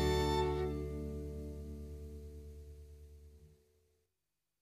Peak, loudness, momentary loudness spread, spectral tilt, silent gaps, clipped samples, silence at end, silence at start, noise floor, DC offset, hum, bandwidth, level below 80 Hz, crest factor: -22 dBFS; -39 LUFS; 23 LU; -6 dB/octave; none; under 0.1%; 1.1 s; 0 s; -90 dBFS; under 0.1%; none; 15 kHz; -46 dBFS; 18 dB